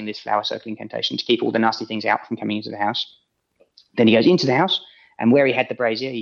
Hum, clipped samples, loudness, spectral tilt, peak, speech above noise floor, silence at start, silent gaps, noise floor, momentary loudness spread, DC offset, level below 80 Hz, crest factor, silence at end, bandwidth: none; under 0.1%; -20 LUFS; -5.5 dB/octave; -2 dBFS; 42 dB; 0 s; none; -62 dBFS; 11 LU; under 0.1%; -72 dBFS; 18 dB; 0 s; 7 kHz